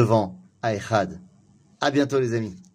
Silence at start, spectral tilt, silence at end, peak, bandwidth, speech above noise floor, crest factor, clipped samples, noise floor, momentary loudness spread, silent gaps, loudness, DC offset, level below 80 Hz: 0 s; -6.5 dB/octave; 0.1 s; -4 dBFS; 14.5 kHz; 34 dB; 20 dB; under 0.1%; -56 dBFS; 11 LU; none; -25 LUFS; under 0.1%; -60 dBFS